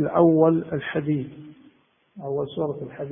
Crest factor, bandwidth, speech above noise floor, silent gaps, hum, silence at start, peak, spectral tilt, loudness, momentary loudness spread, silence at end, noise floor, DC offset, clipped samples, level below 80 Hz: 18 dB; 3.7 kHz; 36 dB; none; none; 0 s; -6 dBFS; -12.5 dB/octave; -23 LUFS; 16 LU; 0 s; -59 dBFS; under 0.1%; under 0.1%; -60 dBFS